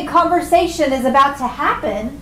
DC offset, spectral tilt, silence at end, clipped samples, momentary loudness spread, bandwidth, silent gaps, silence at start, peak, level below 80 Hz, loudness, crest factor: under 0.1%; -4.5 dB/octave; 0 s; under 0.1%; 6 LU; 16 kHz; none; 0 s; -4 dBFS; -40 dBFS; -16 LUFS; 12 dB